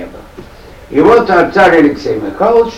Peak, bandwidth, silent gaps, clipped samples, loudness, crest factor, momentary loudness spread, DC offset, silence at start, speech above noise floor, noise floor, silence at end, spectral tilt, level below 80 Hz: 0 dBFS; 11.5 kHz; none; under 0.1%; -9 LUFS; 10 dB; 10 LU; under 0.1%; 0 s; 24 dB; -33 dBFS; 0 s; -6.5 dB/octave; -38 dBFS